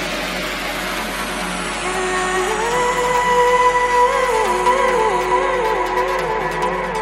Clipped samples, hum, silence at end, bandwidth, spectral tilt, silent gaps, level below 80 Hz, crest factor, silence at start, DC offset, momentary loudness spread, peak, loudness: under 0.1%; none; 0 s; 16.5 kHz; -3 dB/octave; none; -38 dBFS; 14 dB; 0 s; under 0.1%; 8 LU; -4 dBFS; -18 LUFS